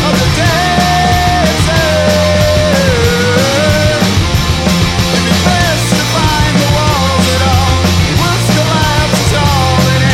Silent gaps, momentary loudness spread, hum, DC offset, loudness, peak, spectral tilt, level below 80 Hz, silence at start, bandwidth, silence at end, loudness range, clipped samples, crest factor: none; 1 LU; none; 0.1%; -10 LUFS; 0 dBFS; -4.5 dB/octave; -22 dBFS; 0 s; 16.5 kHz; 0 s; 1 LU; under 0.1%; 10 dB